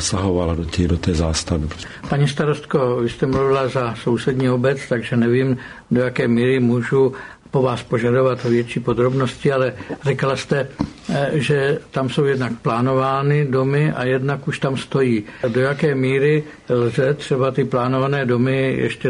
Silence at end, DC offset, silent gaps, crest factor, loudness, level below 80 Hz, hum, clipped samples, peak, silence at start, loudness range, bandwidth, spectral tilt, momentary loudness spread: 0 s; under 0.1%; none; 14 dB; -19 LUFS; -40 dBFS; none; under 0.1%; -6 dBFS; 0 s; 2 LU; 11 kHz; -6.5 dB/octave; 5 LU